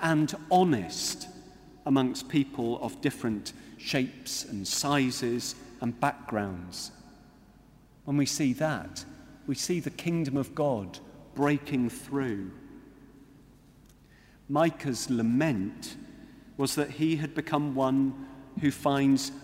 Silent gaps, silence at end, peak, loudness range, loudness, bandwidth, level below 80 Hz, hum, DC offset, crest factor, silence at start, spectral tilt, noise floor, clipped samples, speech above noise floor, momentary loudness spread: none; 0 s; -10 dBFS; 4 LU; -29 LUFS; 16 kHz; -60 dBFS; none; under 0.1%; 20 dB; 0 s; -5 dB/octave; -57 dBFS; under 0.1%; 28 dB; 16 LU